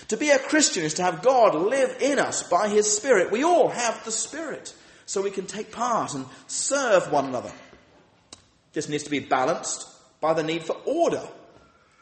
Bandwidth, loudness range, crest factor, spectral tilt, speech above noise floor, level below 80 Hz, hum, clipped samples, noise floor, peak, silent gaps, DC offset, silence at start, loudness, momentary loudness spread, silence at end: 8.8 kHz; 7 LU; 18 dB; -3 dB/octave; 34 dB; -68 dBFS; none; under 0.1%; -57 dBFS; -6 dBFS; none; under 0.1%; 0 s; -24 LUFS; 13 LU; 0.65 s